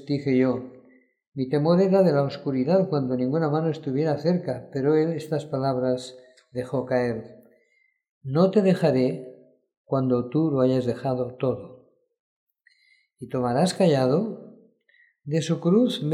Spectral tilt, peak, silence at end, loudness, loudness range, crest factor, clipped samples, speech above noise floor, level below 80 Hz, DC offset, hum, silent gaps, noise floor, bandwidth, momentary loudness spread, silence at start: -7.5 dB/octave; -8 dBFS; 0 s; -24 LUFS; 4 LU; 16 dB; under 0.1%; 44 dB; -68 dBFS; under 0.1%; none; 1.28-1.32 s, 8.09-8.21 s, 9.77-9.84 s, 12.20-12.47 s; -67 dBFS; 12 kHz; 14 LU; 0 s